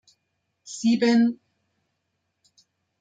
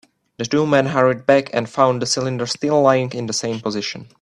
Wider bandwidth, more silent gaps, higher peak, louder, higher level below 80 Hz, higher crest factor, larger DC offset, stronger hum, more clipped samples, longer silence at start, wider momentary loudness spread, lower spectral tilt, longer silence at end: second, 9.2 kHz vs 11.5 kHz; neither; second, -10 dBFS vs 0 dBFS; second, -22 LUFS vs -18 LUFS; second, -74 dBFS vs -60 dBFS; about the same, 16 dB vs 18 dB; neither; neither; neither; first, 0.65 s vs 0.4 s; first, 20 LU vs 8 LU; about the same, -4.5 dB/octave vs -4.5 dB/octave; first, 1.65 s vs 0.2 s